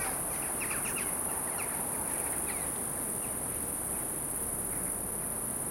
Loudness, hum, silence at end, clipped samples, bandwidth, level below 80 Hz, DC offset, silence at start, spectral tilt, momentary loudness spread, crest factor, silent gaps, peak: -32 LUFS; none; 0 s; under 0.1%; 16.5 kHz; -54 dBFS; under 0.1%; 0 s; -2.5 dB/octave; 2 LU; 16 dB; none; -20 dBFS